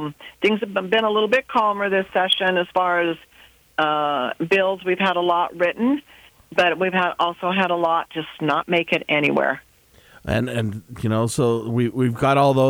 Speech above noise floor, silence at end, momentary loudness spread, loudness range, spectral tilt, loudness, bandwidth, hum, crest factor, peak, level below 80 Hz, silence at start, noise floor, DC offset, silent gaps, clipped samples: 31 dB; 0 s; 7 LU; 2 LU; -5.5 dB/octave; -21 LUFS; over 20 kHz; none; 16 dB; -6 dBFS; -52 dBFS; 0 s; -52 dBFS; under 0.1%; none; under 0.1%